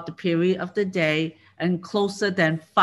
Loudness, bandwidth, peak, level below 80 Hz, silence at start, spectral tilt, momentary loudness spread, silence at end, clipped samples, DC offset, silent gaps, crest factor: -24 LUFS; 12 kHz; -4 dBFS; -68 dBFS; 0 s; -6 dB/octave; 5 LU; 0 s; under 0.1%; under 0.1%; none; 18 dB